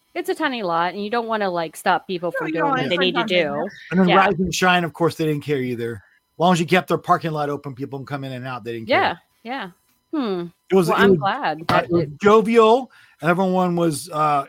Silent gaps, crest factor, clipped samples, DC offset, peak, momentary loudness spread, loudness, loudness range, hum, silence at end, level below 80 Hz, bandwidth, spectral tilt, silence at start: none; 18 dB; under 0.1%; under 0.1%; -2 dBFS; 14 LU; -20 LUFS; 6 LU; none; 0 s; -54 dBFS; 16.5 kHz; -5.5 dB/octave; 0.15 s